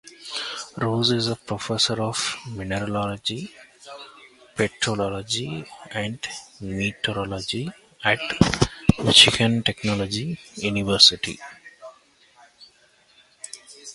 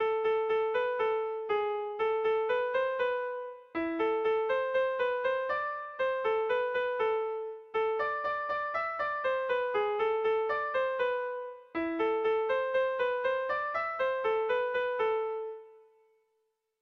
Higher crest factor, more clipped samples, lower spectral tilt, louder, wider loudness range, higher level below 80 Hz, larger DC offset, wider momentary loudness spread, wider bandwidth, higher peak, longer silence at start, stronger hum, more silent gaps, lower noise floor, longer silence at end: first, 24 dB vs 12 dB; neither; second, -3.5 dB/octave vs -5 dB/octave; first, -22 LUFS vs -31 LUFS; first, 10 LU vs 1 LU; first, -46 dBFS vs -70 dBFS; neither; first, 24 LU vs 6 LU; first, 11.5 kHz vs 6 kHz; first, 0 dBFS vs -20 dBFS; about the same, 0.05 s vs 0 s; neither; neither; second, -58 dBFS vs -79 dBFS; second, 0 s vs 1.05 s